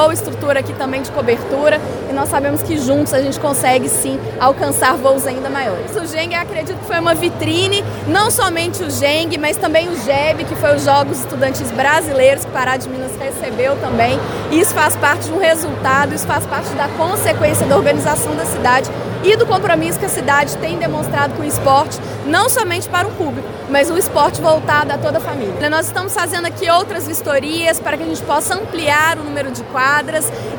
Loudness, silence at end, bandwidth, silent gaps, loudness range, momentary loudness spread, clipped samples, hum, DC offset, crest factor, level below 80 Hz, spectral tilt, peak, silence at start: -15 LUFS; 0 s; over 20 kHz; none; 2 LU; 7 LU; under 0.1%; none; under 0.1%; 16 dB; -44 dBFS; -4 dB/octave; 0 dBFS; 0 s